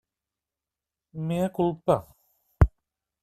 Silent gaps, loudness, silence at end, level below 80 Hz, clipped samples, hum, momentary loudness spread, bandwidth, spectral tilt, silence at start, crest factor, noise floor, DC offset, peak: none; -27 LUFS; 0.55 s; -36 dBFS; under 0.1%; none; 8 LU; 14 kHz; -8.5 dB/octave; 1.15 s; 24 dB; -90 dBFS; under 0.1%; -4 dBFS